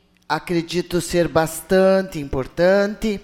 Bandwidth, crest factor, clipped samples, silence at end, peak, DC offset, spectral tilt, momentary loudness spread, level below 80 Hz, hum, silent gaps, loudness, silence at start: 17 kHz; 16 dB; under 0.1%; 0.05 s; -4 dBFS; under 0.1%; -5.5 dB/octave; 10 LU; -40 dBFS; none; none; -20 LUFS; 0.3 s